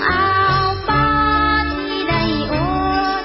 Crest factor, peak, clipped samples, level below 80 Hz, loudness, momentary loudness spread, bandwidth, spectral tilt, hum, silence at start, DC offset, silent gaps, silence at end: 12 dB; -4 dBFS; under 0.1%; -30 dBFS; -17 LUFS; 4 LU; 5.8 kHz; -9.5 dB/octave; none; 0 s; under 0.1%; none; 0 s